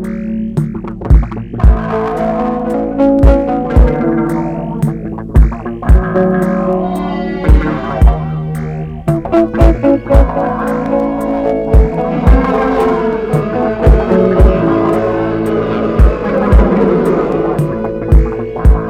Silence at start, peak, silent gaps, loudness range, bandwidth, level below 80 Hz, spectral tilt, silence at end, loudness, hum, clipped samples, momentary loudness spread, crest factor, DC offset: 0 s; 0 dBFS; none; 2 LU; 8.6 kHz; -14 dBFS; -9 dB/octave; 0 s; -13 LUFS; none; 1%; 8 LU; 10 dB; under 0.1%